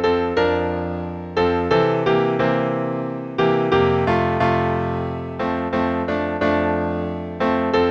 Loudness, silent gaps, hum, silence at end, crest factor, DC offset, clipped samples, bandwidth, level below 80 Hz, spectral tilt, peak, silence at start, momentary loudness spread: -20 LUFS; none; none; 0 s; 16 dB; under 0.1%; under 0.1%; 7.4 kHz; -44 dBFS; -7.5 dB/octave; -4 dBFS; 0 s; 8 LU